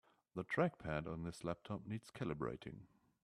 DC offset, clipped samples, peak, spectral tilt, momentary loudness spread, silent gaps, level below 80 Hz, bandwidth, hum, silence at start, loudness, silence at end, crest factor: under 0.1%; under 0.1%; -22 dBFS; -7 dB/octave; 13 LU; none; -66 dBFS; 13 kHz; none; 0.35 s; -44 LUFS; 0.4 s; 22 dB